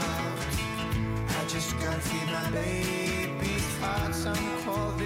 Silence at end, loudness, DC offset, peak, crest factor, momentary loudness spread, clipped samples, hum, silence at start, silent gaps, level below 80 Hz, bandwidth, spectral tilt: 0 s; -30 LUFS; under 0.1%; -20 dBFS; 10 dB; 2 LU; under 0.1%; none; 0 s; none; -42 dBFS; 16 kHz; -4.5 dB/octave